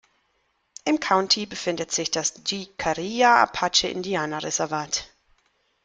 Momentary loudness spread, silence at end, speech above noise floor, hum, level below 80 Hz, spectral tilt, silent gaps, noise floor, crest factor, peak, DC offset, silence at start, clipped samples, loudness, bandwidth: 10 LU; 0.8 s; 47 dB; none; -58 dBFS; -2 dB/octave; none; -70 dBFS; 22 dB; -2 dBFS; under 0.1%; 0.85 s; under 0.1%; -23 LUFS; 10.5 kHz